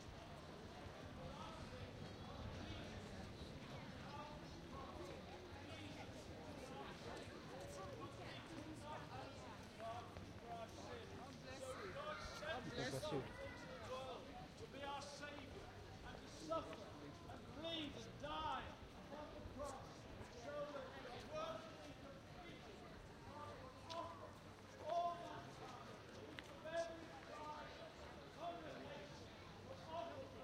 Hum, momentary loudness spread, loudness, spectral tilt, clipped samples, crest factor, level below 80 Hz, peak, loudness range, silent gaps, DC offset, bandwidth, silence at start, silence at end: none; 9 LU; -53 LUFS; -5 dB/octave; under 0.1%; 22 dB; -66 dBFS; -32 dBFS; 4 LU; none; under 0.1%; 15.5 kHz; 0 s; 0 s